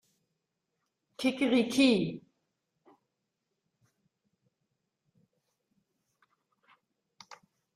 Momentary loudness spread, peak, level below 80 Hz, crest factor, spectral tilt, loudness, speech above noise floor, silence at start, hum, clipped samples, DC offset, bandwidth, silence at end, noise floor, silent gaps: 12 LU; -14 dBFS; -74 dBFS; 22 dB; -5 dB/octave; -28 LUFS; 57 dB; 1.2 s; none; under 0.1%; under 0.1%; 14 kHz; 5.55 s; -84 dBFS; none